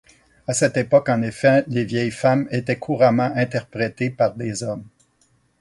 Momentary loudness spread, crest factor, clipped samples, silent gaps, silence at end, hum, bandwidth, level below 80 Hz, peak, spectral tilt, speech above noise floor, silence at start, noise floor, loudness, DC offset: 10 LU; 18 dB; under 0.1%; none; 0.75 s; none; 11.5 kHz; -58 dBFS; -2 dBFS; -5.5 dB/octave; 42 dB; 0.5 s; -62 dBFS; -20 LUFS; under 0.1%